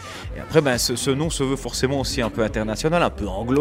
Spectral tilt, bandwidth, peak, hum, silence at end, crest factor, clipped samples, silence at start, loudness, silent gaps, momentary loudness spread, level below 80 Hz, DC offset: -4.5 dB/octave; 16 kHz; -2 dBFS; none; 0 s; 20 dB; under 0.1%; 0 s; -22 LUFS; none; 4 LU; -36 dBFS; under 0.1%